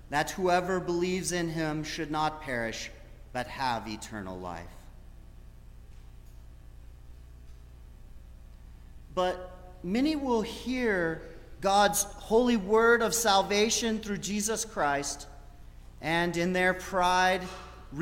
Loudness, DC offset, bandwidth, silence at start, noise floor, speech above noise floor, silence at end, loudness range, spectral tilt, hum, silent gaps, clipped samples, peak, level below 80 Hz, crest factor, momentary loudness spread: -28 LUFS; under 0.1%; 16.5 kHz; 0 s; -49 dBFS; 20 dB; 0 s; 14 LU; -3.5 dB/octave; 60 Hz at -50 dBFS; none; under 0.1%; -10 dBFS; -48 dBFS; 20 dB; 16 LU